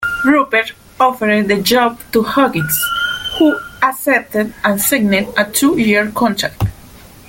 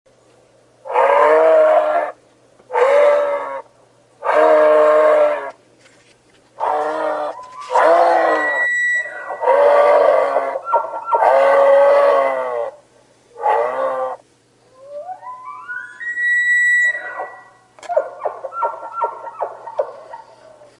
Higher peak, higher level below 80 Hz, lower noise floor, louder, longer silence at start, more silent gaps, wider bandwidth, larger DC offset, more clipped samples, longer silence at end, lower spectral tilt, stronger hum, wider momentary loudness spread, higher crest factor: about the same, 0 dBFS vs -2 dBFS; first, -42 dBFS vs -72 dBFS; second, -39 dBFS vs -54 dBFS; about the same, -14 LUFS vs -15 LUFS; second, 0 s vs 0.85 s; neither; first, 17 kHz vs 11 kHz; neither; neither; second, 0.3 s vs 0.6 s; first, -4 dB/octave vs -2.5 dB/octave; neither; second, 5 LU vs 18 LU; about the same, 14 dB vs 16 dB